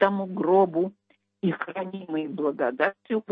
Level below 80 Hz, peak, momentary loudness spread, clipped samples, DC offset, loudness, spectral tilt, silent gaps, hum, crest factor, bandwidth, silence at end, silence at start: -76 dBFS; -8 dBFS; 10 LU; under 0.1%; under 0.1%; -26 LUFS; -9.5 dB/octave; none; none; 18 dB; 5.2 kHz; 0.1 s; 0 s